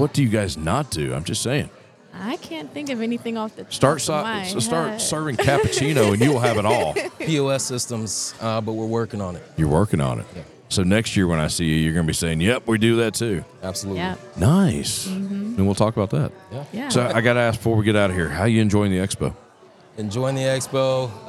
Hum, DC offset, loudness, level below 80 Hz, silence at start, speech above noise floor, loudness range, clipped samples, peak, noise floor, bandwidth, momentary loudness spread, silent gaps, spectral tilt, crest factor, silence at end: none; under 0.1%; -21 LUFS; -46 dBFS; 0 s; 28 dB; 4 LU; under 0.1%; -2 dBFS; -49 dBFS; 15.5 kHz; 11 LU; none; -5 dB/octave; 20 dB; 0 s